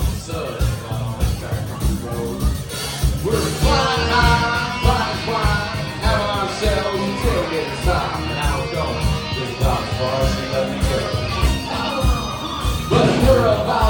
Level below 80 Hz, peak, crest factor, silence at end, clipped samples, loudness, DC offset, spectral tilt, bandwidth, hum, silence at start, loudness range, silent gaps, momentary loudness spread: -26 dBFS; -2 dBFS; 18 dB; 0 s; under 0.1%; -20 LUFS; under 0.1%; -5 dB/octave; 18.5 kHz; none; 0 s; 3 LU; none; 8 LU